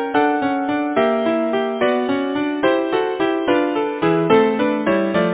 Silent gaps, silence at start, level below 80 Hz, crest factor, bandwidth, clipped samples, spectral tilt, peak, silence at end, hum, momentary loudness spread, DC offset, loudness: none; 0 s; -56 dBFS; 18 dB; 4 kHz; under 0.1%; -10 dB/octave; 0 dBFS; 0 s; none; 5 LU; under 0.1%; -18 LUFS